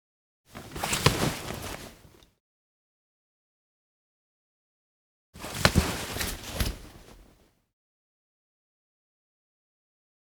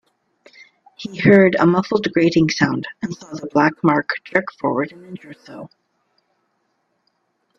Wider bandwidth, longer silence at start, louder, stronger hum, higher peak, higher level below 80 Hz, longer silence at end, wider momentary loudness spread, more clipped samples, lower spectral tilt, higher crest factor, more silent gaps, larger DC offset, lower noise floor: first, over 20 kHz vs 7.4 kHz; second, 0.55 s vs 1 s; second, -29 LUFS vs -17 LUFS; neither; about the same, 0 dBFS vs 0 dBFS; first, -44 dBFS vs -58 dBFS; first, 3.15 s vs 1.9 s; about the same, 22 LU vs 24 LU; neither; second, -3.5 dB/octave vs -6.5 dB/octave; first, 34 dB vs 20 dB; first, 2.40-5.33 s vs none; neither; second, -61 dBFS vs -69 dBFS